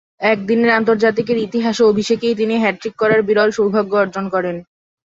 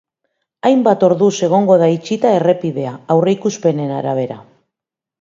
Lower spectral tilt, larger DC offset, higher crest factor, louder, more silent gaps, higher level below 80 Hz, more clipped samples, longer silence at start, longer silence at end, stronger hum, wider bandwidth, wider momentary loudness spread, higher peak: about the same, -5.5 dB/octave vs -6.5 dB/octave; neither; about the same, 14 dB vs 14 dB; about the same, -16 LUFS vs -15 LUFS; neither; first, -58 dBFS vs -64 dBFS; neither; second, 0.2 s vs 0.65 s; second, 0.5 s vs 0.8 s; neither; about the same, 7.8 kHz vs 7.8 kHz; second, 6 LU vs 9 LU; about the same, -2 dBFS vs 0 dBFS